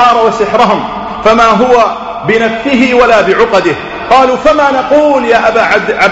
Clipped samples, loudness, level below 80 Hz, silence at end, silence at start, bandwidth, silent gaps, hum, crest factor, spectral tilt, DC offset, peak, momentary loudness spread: 0.8%; -8 LUFS; -36 dBFS; 0 s; 0 s; 8.6 kHz; none; none; 8 dB; -5 dB/octave; under 0.1%; 0 dBFS; 6 LU